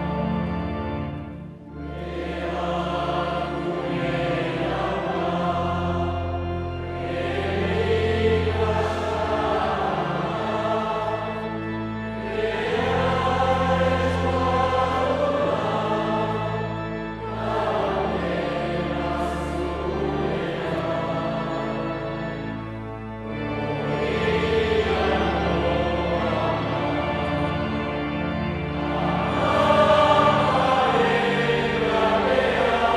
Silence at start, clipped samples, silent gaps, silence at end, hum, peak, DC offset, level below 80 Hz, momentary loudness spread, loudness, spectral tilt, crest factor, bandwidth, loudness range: 0 s; under 0.1%; none; 0 s; none; -4 dBFS; under 0.1%; -42 dBFS; 9 LU; -24 LUFS; -6.5 dB/octave; 18 dB; 12 kHz; 7 LU